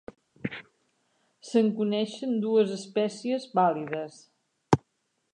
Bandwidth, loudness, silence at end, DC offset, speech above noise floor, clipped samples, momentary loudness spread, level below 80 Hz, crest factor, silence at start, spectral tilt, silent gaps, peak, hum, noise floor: 10 kHz; -28 LUFS; 0.6 s; under 0.1%; 49 dB; under 0.1%; 13 LU; -62 dBFS; 22 dB; 0.45 s; -6.5 dB/octave; none; -6 dBFS; none; -76 dBFS